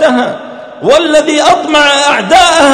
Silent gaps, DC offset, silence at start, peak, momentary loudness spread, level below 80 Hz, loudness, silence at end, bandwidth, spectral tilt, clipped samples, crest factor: none; under 0.1%; 0 s; 0 dBFS; 11 LU; -40 dBFS; -7 LUFS; 0 s; 15.5 kHz; -2 dB/octave; 3%; 8 dB